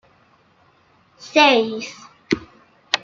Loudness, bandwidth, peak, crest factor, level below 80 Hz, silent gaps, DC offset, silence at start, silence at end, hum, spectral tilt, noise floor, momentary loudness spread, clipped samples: -18 LUFS; 7.8 kHz; -2 dBFS; 20 dB; -60 dBFS; none; under 0.1%; 1.2 s; 0.05 s; none; -3 dB/octave; -57 dBFS; 16 LU; under 0.1%